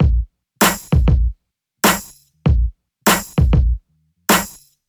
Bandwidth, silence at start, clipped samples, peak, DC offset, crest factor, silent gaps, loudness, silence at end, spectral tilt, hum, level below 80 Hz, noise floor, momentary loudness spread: over 20 kHz; 0 s; under 0.1%; -2 dBFS; under 0.1%; 16 dB; none; -17 LUFS; 0.4 s; -4.5 dB/octave; none; -20 dBFS; -61 dBFS; 10 LU